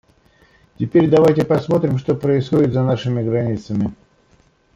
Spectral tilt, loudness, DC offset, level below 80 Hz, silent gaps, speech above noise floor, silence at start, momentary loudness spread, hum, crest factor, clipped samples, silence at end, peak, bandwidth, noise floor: -8.5 dB/octave; -17 LUFS; under 0.1%; -50 dBFS; none; 39 dB; 0.8 s; 9 LU; none; 16 dB; under 0.1%; 0.8 s; -2 dBFS; 10.5 kHz; -56 dBFS